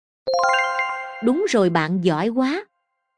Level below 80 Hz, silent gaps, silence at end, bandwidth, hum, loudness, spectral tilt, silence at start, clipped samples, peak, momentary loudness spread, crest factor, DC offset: -68 dBFS; none; 0.55 s; 10.5 kHz; none; -21 LUFS; -5.5 dB/octave; 0.25 s; under 0.1%; -4 dBFS; 6 LU; 18 dB; under 0.1%